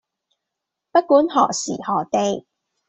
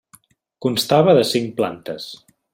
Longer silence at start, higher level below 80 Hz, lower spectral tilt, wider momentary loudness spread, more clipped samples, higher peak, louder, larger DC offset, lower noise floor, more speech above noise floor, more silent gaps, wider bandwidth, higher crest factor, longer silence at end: first, 0.95 s vs 0.6 s; about the same, -64 dBFS vs -62 dBFS; about the same, -4 dB/octave vs -5 dB/octave; second, 9 LU vs 17 LU; neither; about the same, -2 dBFS vs -2 dBFS; about the same, -19 LUFS vs -18 LUFS; neither; first, -82 dBFS vs -54 dBFS; first, 64 dB vs 36 dB; neither; second, 8.2 kHz vs 16.5 kHz; about the same, 18 dB vs 18 dB; about the same, 0.5 s vs 0.4 s